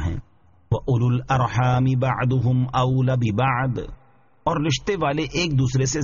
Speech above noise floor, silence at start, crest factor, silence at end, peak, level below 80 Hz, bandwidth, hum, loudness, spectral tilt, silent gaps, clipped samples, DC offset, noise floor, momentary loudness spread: 35 dB; 0 s; 14 dB; 0 s; -8 dBFS; -42 dBFS; 7.2 kHz; none; -22 LUFS; -6 dB/octave; none; under 0.1%; 0.1%; -55 dBFS; 7 LU